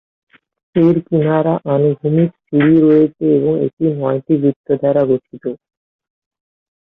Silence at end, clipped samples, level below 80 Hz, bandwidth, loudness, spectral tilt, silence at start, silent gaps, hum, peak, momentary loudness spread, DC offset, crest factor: 1.3 s; under 0.1%; -56 dBFS; 3.9 kHz; -15 LUFS; -11.5 dB/octave; 0.75 s; 3.73-3.77 s, 4.56-4.64 s; none; -2 dBFS; 8 LU; under 0.1%; 12 dB